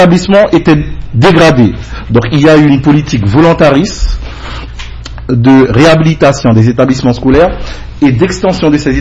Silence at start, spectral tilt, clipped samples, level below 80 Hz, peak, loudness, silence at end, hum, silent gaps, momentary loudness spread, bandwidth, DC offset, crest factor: 0 s; -6.5 dB/octave; 3%; -22 dBFS; 0 dBFS; -7 LUFS; 0 s; none; none; 17 LU; 11 kHz; under 0.1%; 6 dB